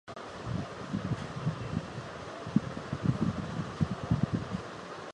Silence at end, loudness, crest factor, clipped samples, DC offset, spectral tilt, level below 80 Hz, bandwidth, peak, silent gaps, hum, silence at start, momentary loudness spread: 0 s; -35 LUFS; 24 dB; under 0.1%; under 0.1%; -7 dB/octave; -50 dBFS; 10.5 kHz; -12 dBFS; none; none; 0.05 s; 10 LU